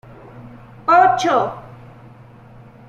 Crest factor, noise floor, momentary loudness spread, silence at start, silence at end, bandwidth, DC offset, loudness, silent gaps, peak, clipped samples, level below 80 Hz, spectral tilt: 18 dB; -43 dBFS; 13 LU; 0.35 s; 1.15 s; 8.8 kHz; under 0.1%; -16 LUFS; none; -2 dBFS; under 0.1%; -54 dBFS; -4.5 dB/octave